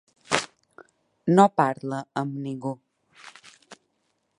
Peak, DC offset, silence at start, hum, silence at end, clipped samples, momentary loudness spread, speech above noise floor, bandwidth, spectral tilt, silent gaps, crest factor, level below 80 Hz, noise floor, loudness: -2 dBFS; under 0.1%; 0.3 s; none; 0.65 s; under 0.1%; 23 LU; 51 dB; 11.5 kHz; -5.5 dB/octave; none; 26 dB; -72 dBFS; -73 dBFS; -24 LUFS